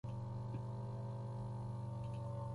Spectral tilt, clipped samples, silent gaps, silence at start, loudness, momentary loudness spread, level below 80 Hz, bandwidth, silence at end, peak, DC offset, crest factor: -9 dB/octave; under 0.1%; none; 0.05 s; -46 LUFS; 1 LU; -62 dBFS; 11 kHz; 0 s; -36 dBFS; under 0.1%; 8 dB